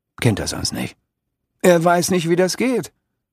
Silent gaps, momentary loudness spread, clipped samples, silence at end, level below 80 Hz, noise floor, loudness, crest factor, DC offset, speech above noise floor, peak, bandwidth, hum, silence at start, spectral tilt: none; 12 LU; under 0.1%; 0.45 s; -48 dBFS; -76 dBFS; -18 LUFS; 18 dB; under 0.1%; 59 dB; 0 dBFS; 15.5 kHz; none; 0.2 s; -5 dB/octave